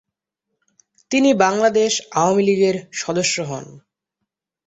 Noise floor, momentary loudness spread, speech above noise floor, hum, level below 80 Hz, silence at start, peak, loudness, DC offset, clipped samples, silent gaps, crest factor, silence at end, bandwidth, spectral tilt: -80 dBFS; 9 LU; 62 dB; none; -62 dBFS; 1.1 s; -2 dBFS; -18 LUFS; under 0.1%; under 0.1%; none; 18 dB; 0.9 s; 8.2 kHz; -4 dB/octave